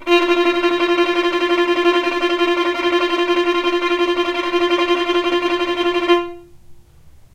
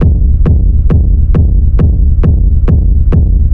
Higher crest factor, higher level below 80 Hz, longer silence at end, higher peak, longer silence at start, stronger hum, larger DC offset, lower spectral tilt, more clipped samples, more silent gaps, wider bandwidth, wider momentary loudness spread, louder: first, 14 dB vs 6 dB; second, -50 dBFS vs -8 dBFS; first, 0.25 s vs 0 s; second, -4 dBFS vs 0 dBFS; about the same, 0 s vs 0 s; neither; second, under 0.1% vs 4%; second, -3 dB/octave vs -12 dB/octave; neither; neither; first, 9.4 kHz vs 3 kHz; about the same, 3 LU vs 1 LU; second, -17 LUFS vs -10 LUFS